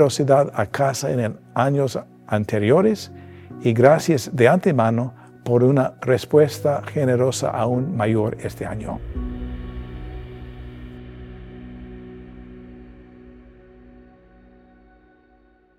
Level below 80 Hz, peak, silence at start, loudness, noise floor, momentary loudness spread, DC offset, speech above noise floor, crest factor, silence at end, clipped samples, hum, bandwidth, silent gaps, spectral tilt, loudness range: -42 dBFS; 0 dBFS; 0 s; -20 LUFS; -56 dBFS; 23 LU; under 0.1%; 37 dB; 22 dB; 2.5 s; under 0.1%; none; 15 kHz; none; -6.5 dB/octave; 21 LU